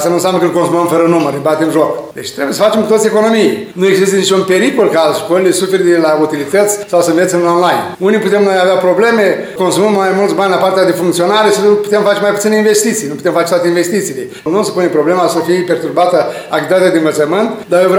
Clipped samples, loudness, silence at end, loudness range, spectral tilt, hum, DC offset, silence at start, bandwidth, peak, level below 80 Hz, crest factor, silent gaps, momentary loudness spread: under 0.1%; -11 LUFS; 0 s; 2 LU; -4.5 dB/octave; none; under 0.1%; 0 s; 17 kHz; 0 dBFS; -58 dBFS; 10 dB; none; 5 LU